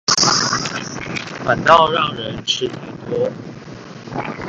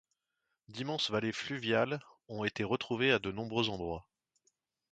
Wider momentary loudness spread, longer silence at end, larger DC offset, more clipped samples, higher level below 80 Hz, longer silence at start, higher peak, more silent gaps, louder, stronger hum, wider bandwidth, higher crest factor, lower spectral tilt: first, 21 LU vs 12 LU; second, 0 s vs 0.9 s; neither; neither; first, -50 dBFS vs -64 dBFS; second, 0.1 s vs 0.7 s; first, 0 dBFS vs -14 dBFS; neither; first, -17 LUFS vs -34 LUFS; neither; about the same, 9.4 kHz vs 9 kHz; about the same, 20 dB vs 22 dB; second, -2.5 dB/octave vs -5 dB/octave